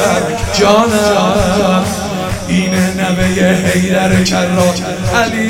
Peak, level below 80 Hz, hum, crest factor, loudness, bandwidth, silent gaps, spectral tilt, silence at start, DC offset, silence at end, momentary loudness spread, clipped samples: 0 dBFS; -30 dBFS; none; 12 dB; -12 LUFS; 16.5 kHz; none; -5 dB/octave; 0 s; under 0.1%; 0 s; 5 LU; under 0.1%